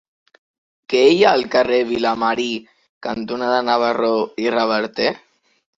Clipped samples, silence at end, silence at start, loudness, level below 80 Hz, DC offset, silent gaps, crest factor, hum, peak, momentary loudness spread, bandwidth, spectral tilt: under 0.1%; 0.6 s; 0.9 s; -18 LUFS; -60 dBFS; under 0.1%; 2.89-3.01 s; 18 dB; none; -2 dBFS; 12 LU; 7.8 kHz; -4.5 dB/octave